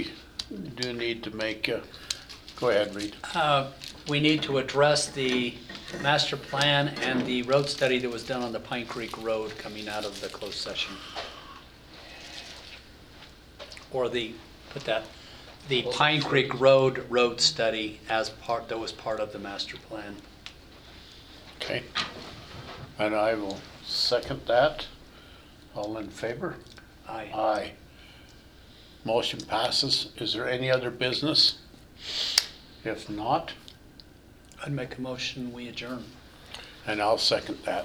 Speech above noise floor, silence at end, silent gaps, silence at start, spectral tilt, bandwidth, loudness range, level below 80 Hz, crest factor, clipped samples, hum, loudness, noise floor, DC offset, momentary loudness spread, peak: 24 dB; 0 s; none; 0 s; -3.5 dB/octave; over 20 kHz; 11 LU; -56 dBFS; 30 dB; under 0.1%; none; -28 LUFS; -52 dBFS; under 0.1%; 21 LU; 0 dBFS